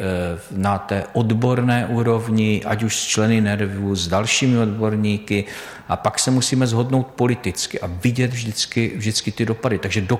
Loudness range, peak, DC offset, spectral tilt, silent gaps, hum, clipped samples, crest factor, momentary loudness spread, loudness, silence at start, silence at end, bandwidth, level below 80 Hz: 2 LU; -4 dBFS; under 0.1%; -5 dB/octave; none; none; under 0.1%; 14 dB; 6 LU; -20 LUFS; 0 s; 0 s; 15.5 kHz; -48 dBFS